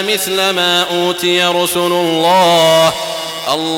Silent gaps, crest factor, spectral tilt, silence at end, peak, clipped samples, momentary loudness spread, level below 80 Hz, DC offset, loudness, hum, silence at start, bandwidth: none; 12 dB; -3 dB/octave; 0 s; -2 dBFS; under 0.1%; 8 LU; -56 dBFS; under 0.1%; -12 LUFS; none; 0 s; 18.5 kHz